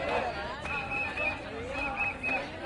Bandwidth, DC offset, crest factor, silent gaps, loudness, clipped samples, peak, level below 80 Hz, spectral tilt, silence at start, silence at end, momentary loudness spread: 11.5 kHz; under 0.1%; 16 dB; none; -32 LUFS; under 0.1%; -18 dBFS; -50 dBFS; -5 dB/octave; 0 s; 0 s; 6 LU